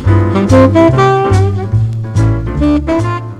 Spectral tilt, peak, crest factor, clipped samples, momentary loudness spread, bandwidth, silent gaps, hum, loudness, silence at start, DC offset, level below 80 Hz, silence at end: -8 dB/octave; 0 dBFS; 10 dB; 0.3%; 7 LU; 10 kHz; none; none; -11 LUFS; 0 s; under 0.1%; -24 dBFS; 0 s